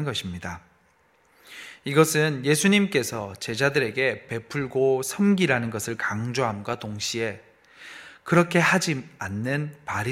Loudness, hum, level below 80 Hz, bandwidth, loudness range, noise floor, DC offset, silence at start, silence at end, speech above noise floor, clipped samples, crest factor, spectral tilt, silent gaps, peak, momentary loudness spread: -24 LUFS; none; -60 dBFS; 16.5 kHz; 3 LU; -62 dBFS; under 0.1%; 0 s; 0 s; 38 dB; under 0.1%; 22 dB; -4.5 dB/octave; none; -4 dBFS; 18 LU